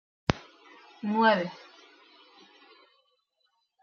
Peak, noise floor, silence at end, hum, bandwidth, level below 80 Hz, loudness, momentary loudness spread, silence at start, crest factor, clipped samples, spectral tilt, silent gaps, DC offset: -2 dBFS; -75 dBFS; 2.25 s; none; 7 kHz; -54 dBFS; -28 LUFS; 15 LU; 0.3 s; 30 dB; under 0.1%; -3.5 dB/octave; none; under 0.1%